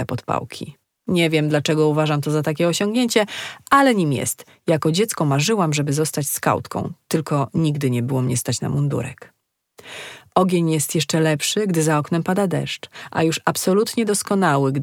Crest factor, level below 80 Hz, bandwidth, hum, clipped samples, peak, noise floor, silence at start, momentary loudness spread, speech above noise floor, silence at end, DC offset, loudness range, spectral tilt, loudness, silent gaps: 18 dB; -60 dBFS; 18.5 kHz; none; under 0.1%; -2 dBFS; -52 dBFS; 0 s; 10 LU; 32 dB; 0 s; under 0.1%; 4 LU; -5 dB/octave; -20 LUFS; none